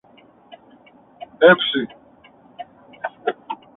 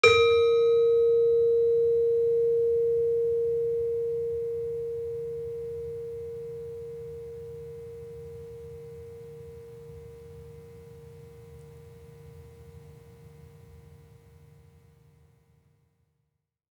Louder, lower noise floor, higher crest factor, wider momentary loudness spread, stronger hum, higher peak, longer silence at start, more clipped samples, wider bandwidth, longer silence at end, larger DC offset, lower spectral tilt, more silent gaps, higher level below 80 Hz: first, -18 LUFS vs -26 LUFS; second, -51 dBFS vs -80 dBFS; about the same, 22 dB vs 24 dB; about the same, 26 LU vs 26 LU; neither; first, 0 dBFS vs -4 dBFS; first, 0.5 s vs 0.05 s; neither; second, 4 kHz vs 9.4 kHz; second, 0.25 s vs 3 s; neither; first, -8.5 dB/octave vs -4 dB/octave; neither; second, -66 dBFS vs -60 dBFS